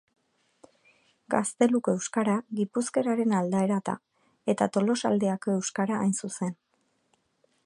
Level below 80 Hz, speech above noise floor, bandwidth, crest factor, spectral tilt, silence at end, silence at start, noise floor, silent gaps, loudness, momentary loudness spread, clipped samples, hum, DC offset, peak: -74 dBFS; 46 dB; 11.5 kHz; 20 dB; -5.5 dB/octave; 1.15 s; 1.3 s; -72 dBFS; none; -28 LUFS; 8 LU; under 0.1%; none; under 0.1%; -8 dBFS